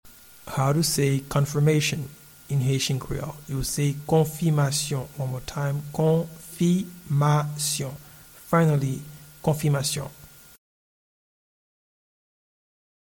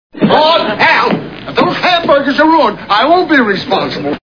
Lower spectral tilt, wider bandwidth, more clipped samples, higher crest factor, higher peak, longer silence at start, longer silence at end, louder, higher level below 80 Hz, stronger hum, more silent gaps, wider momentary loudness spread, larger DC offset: about the same, -5.5 dB/octave vs -6 dB/octave; first, 19 kHz vs 5.4 kHz; second, under 0.1% vs 0.3%; first, 18 dB vs 10 dB; second, -8 dBFS vs 0 dBFS; about the same, 0.05 s vs 0.15 s; first, 2.9 s vs 0.1 s; second, -25 LUFS vs -10 LUFS; about the same, -50 dBFS vs -46 dBFS; neither; neither; first, 11 LU vs 6 LU; second, under 0.1% vs 0.4%